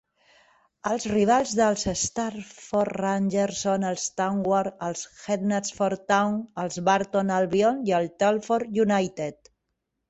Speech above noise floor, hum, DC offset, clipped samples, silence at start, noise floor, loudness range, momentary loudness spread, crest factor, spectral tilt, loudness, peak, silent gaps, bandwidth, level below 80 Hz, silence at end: 55 dB; none; under 0.1%; under 0.1%; 0.85 s; -80 dBFS; 2 LU; 9 LU; 18 dB; -4.5 dB/octave; -25 LUFS; -8 dBFS; none; 8.2 kHz; -58 dBFS; 0.75 s